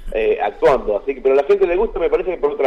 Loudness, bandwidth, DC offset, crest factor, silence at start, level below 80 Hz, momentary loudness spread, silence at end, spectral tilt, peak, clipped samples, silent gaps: -17 LUFS; 7.6 kHz; under 0.1%; 10 dB; 0 s; -34 dBFS; 4 LU; 0 s; -6.5 dB/octave; -6 dBFS; under 0.1%; none